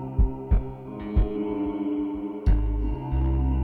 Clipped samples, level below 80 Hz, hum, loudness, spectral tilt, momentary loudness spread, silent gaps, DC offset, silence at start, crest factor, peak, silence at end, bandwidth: under 0.1%; -26 dBFS; none; -28 LUFS; -11 dB/octave; 4 LU; none; under 0.1%; 0 s; 12 dB; -12 dBFS; 0 s; 3.5 kHz